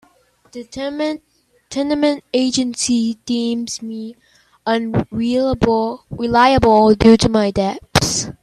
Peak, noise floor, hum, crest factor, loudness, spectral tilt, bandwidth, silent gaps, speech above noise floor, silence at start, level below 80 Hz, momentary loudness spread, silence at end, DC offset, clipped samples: 0 dBFS; -55 dBFS; none; 16 dB; -16 LUFS; -4.5 dB/octave; 13.5 kHz; none; 39 dB; 0.55 s; -40 dBFS; 16 LU; 0.1 s; under 0.1%; under 0.1%